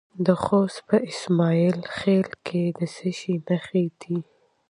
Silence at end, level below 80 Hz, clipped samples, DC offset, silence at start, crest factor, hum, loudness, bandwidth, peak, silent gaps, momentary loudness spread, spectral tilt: 0.5 s; -60 dBFS; under 0.1%; under 0.1%; 0.15 s; 18 dB; none; -24 LUFS; 10.5 kHz; -6 dBFS; none; 8 LU; -7 dB/octave